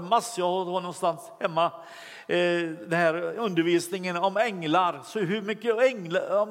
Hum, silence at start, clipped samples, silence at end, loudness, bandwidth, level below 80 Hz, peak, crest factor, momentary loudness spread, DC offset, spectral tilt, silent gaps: none; 0 s; under 0.1%; 0 s; -26 LUFS; 16 kHz; -84 dBFS; -8 dBFS; 18 dB; 6 LU; under 0.1%; -5 dB/octave; none